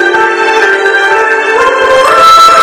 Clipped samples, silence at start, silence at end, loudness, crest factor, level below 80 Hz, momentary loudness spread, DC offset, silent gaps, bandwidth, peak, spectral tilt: 10%; 0 s; 0 s; -5 LUFS; 6 dB; -42 dBFS; 6 LU; under 0.1%; none; over 20 kHz; 0 dBFS; -1.5 dB/octave